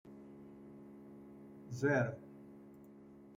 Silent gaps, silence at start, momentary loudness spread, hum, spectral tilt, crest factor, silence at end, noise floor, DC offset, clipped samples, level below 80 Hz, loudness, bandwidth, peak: none; 0.05 s; 23 LU; none; -7.5 dB/octave; 20 dB; 0 s; -58 dBFS; under 0.1%; under 0.1%; -74 dBFS; -36 LUFS; 15.5 kHz; -22 dBFS